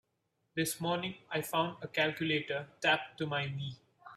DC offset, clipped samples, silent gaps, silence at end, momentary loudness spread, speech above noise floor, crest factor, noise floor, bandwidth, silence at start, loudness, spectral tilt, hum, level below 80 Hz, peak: under 0.1%; under 0.1%; none; 0 s; 10 LU; 46 dB; 20 dB; -81 dBFS; 15.5 kHz; 0.55 s; -34 LUFS; -4 dB/octave; none; -74 dBFS; -16 dBFS